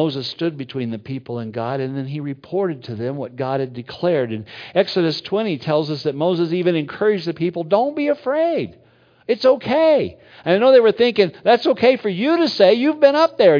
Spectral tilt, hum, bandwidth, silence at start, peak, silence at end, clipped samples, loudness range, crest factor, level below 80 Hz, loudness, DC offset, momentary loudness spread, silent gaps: -7 dB/octave; none; 5.2 kHz; 0 s; 0 dBFS; 0 s; under 0.1%; 9 LU; 18 dB; -64 dBFS; -19 LUFS; under 0.1%; 12 LU; none